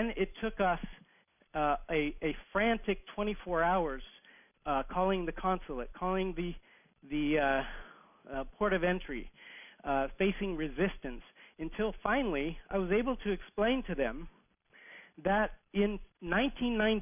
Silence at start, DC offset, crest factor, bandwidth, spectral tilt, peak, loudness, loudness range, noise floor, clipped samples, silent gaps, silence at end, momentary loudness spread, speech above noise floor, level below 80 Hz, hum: 0 s; under 0.1%; 18 dB; 3.7 kHz; -4 dB/octave; -16 dBFS; -34 LUFS; 2 LU; -68 dBFS; under 0.1%; none; 0 s; 14 LU; 36 dB; -48 dBFS; none